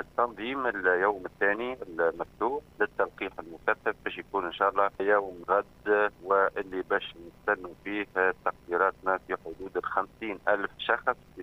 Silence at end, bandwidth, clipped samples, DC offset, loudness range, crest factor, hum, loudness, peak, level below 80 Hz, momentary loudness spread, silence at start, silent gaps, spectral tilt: 0 s; 15.5 kHz; under 0.1%; under 0.1%; 3 LU; 20 dB; none; -29 LUFS; -10 dBFS; -60 dBFS; 9 LU; 0 s; none; -6 dB/octave